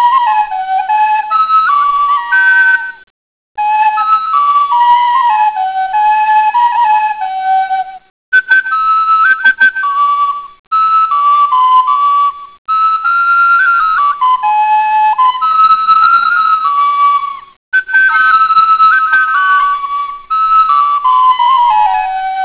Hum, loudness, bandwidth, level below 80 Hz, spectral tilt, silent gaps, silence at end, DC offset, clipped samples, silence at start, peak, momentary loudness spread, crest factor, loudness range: none; -9 LUFS; 4 kHz; -54 dBFS; -2.5 dB/octave; 3.10-3.55 s, 8.10-8.32 s, 10.59-10.71 s, 12.58-12.65 s, 17.57-17.72 s; 0 s; 0.2%; under 0.1%; 0 s; -2 dBFS; 8 LU; 8 dB; 2 LU